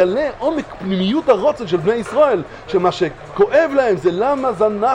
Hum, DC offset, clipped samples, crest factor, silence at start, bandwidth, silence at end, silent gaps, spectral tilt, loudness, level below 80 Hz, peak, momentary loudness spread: none; under 0.1%; under 0.1%; 16 dB; 0 s; 10.5 kHz; 0 s; none; -6.5 dB/octave; -17 LUFS; -46 dBFS; 0 dBFS; 7 LU